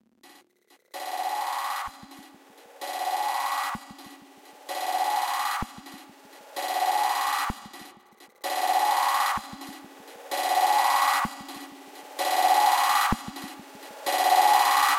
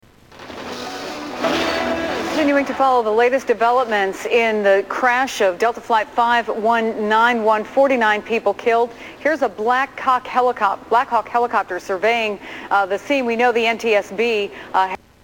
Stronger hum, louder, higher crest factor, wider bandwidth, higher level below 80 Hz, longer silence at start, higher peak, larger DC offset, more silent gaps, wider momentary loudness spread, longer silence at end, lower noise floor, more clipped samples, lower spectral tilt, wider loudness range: neither; second, -25 LUFS vs -18 LUFS; about the same, 20 dB vs 16 dB; second, 16 kHz vs 18.5 kHz; about the same, -54 dBFS vs -54 dBFS; first, 0.95 s vs 0.3 s; second, -8 dBFS vs -4 dBFS; neither; neither; first, 23 LU vs 8 LU; second, 0 s vs 0.25 s; first, -63 dBFS vs -41 dBFS; neither; second, -1.5 dB/octave vs -3.5 dB/octave; first, 8 LU vs 2 LU